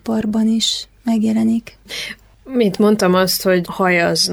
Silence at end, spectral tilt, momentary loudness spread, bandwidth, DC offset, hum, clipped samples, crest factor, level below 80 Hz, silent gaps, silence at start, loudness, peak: 0 s; -4.5 dB/octave; 12 LU; 19.5 kHz; under 0.1%; none; under 0.1%; 14 dB; -50 dBFS; none; 0.05 s; -16 LUFS; -4 dBFS